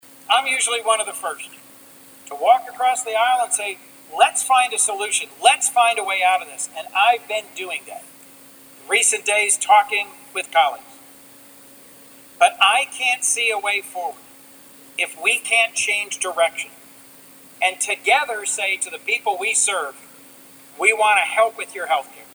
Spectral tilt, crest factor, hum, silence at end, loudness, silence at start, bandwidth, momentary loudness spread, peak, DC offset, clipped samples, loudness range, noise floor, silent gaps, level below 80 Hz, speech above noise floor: 2 dB/octave; 20 dB; none; 0.1 s; -19 LUFS; 0.3 s; over 20 kHz; 13 LU; -2 dBFS; under 0.1%; under 0.1%; 3 LU; -46 dBFS; none; -78 dBFS; 26 dB